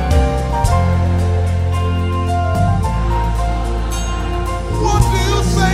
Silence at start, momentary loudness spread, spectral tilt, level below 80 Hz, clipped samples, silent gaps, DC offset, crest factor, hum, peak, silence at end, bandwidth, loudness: 0 s; 6 LU; -6 dB/octave; -20 dBFS; under 0.1%; none; under 0.1%; 14 dB; none; 0 dBFS; 0 s; 14.5 kHz; -17 LUFS